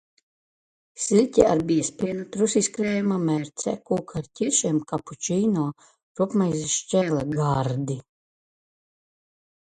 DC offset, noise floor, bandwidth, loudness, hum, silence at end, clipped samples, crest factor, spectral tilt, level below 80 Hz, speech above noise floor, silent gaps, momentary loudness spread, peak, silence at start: under 0.1%; under -90 dBFS; 9.6 kHz; -24 LUFS; none; 1.6 s; under 0.1%; 22 dB; -5 dB/octave; -56 dBFS; over 66 dB; 6.03-6.15 s; 10 LU; -4 dBFS; 0.95 s